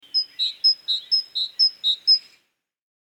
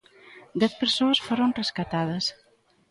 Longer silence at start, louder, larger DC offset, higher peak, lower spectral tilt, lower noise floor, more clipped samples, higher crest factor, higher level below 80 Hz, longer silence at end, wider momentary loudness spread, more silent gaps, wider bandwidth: second, 0.15 s vs 0.3 s; first, -19 LUFS vs -25 LUFS; neither; about the same, -8 dBFS vs -10 dBFS; second, 3 dB/octave vs -4.5 dB/octave; first, -66 dBFS vs -51 dBFS; neither; about the same, 16 dB vs 18 dB; second, -86 dBFS vs -62 dBFS; first, 0.9 s vs 0.6 s; about the same, 6 LU vs 7 LU; neither; first, 17 kHz vs 11.5 kHz